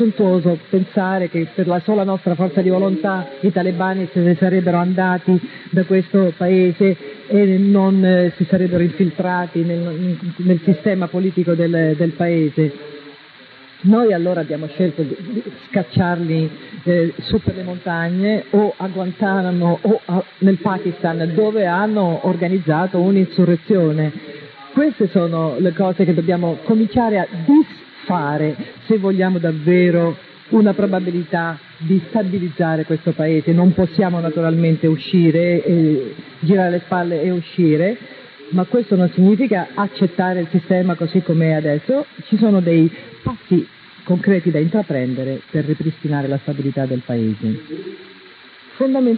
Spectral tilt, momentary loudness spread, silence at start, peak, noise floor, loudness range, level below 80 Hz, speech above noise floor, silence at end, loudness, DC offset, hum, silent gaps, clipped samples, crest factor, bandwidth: -12 dB/octave; 8 LU; 0 s; -2 dBFS; -43 dBFS; 4 LU; -52 dBFS; 26 dB; 0 s; -17 LUFS; under 0.1%; none; none; under 0.1%; 14 dB; 4.8 kHz